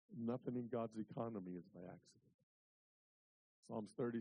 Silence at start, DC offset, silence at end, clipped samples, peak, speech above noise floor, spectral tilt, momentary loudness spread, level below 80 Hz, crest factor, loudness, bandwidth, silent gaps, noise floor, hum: 0.1 s; under 0.1%; 0 s; under 0.1%; -32 dBFS; over 43 dB; -8.5 dB/octave; 13 LU; -86 dBFS; 18 dB; -48 LUFS; 9.6 kHz; 2.34-3.63 s; under -90 dBFS; none